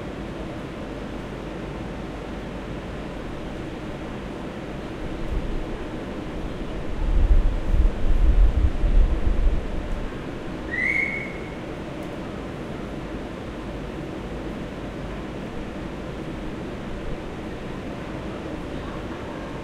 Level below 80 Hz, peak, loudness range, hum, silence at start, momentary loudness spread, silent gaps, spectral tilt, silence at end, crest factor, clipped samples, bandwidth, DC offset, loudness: -26 dBFS; -6 dBFS; 9 LU; none; 0 s; 10 LU; none; -7 dB/octave; 0 s; 18 dB; under 0.1%; 9.2 kHz; under 0.1%; -29 LUFS